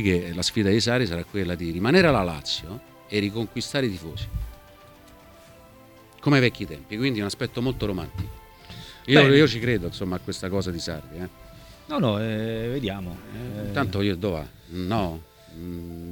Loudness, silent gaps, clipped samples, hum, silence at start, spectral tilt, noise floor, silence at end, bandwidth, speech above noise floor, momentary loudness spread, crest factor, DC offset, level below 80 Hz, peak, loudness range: -24 LUFS; none; under 0.1%; none; 0 s; -5.5 dB/octave; -50 dBFS; 0 s; 19 kHz; 26 dB; 18 LU; 24 dB; under 0.1%; -44 dBFS; -2 dBFS; 7 LU